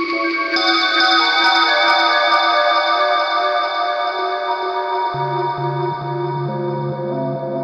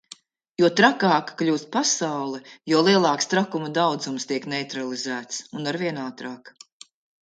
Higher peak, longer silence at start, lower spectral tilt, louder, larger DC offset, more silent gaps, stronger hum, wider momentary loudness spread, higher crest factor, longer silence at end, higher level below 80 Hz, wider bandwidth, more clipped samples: about the same, -2 dBFS vs -2 dBFS; second, 0 s vs 0.6 s; about the same, -4.5 dB/octave vs -3.5 dB/octave; first, -16 LUFS vs -23 LUFS; neither; neither; neither; second, 10 LU vs 15 LU; second, 14 dB vs 22 dB; second, 0 s vs 0.75 s; first, -64 dBFS vs -72 dBFS; about the same, 9.4 kHz vs 9.4 kHz; neither